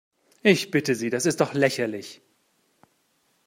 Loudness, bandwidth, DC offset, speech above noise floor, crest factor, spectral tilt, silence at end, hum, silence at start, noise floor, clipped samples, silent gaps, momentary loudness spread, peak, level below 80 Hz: -23 LUFS; 16 kHz; under 0.1%; 45 dB; 22 dB; -4.5 dB/octave; 1.3 s; none; 0.45 s; -68 dBFS; under 0.1%; none; 10 LU; -4 dBFS; -70 dBFS